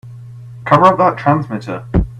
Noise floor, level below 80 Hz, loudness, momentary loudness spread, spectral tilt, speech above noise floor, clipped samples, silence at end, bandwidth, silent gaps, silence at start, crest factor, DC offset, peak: -33 dBFS; -28 dBFS; -13 LUFS; 24 LU; -8 dB/octave; 20 dB; under 0.1%; 0 s; 10.5 kHz; none; 0.05 s; 14 dB; under 0.1%; 0 dBFS